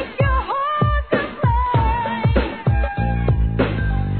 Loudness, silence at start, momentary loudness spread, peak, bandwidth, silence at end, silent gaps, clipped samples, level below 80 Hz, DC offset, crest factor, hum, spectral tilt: -20 LUFS; 0 s; 3 LU; -2 dBFS; 4.5 kHz; 0 s; none; under 0.1%; -24 dBFS; 0.3%; 16 dB; none; -11 dB/octave